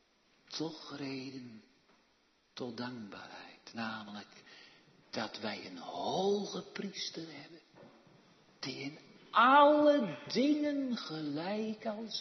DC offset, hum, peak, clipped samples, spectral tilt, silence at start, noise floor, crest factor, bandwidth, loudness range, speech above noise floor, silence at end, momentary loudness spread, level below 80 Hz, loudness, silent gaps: under 0.1%; none; -14 dBFS; under 0.1%; -3 dB/octave; 0.5 s; -72 dBFS; 22 dB; 6.2 kHz; 16 LU; 38 dB; 0 s; 22 LU; -84 dBFS; -33 LUFS; none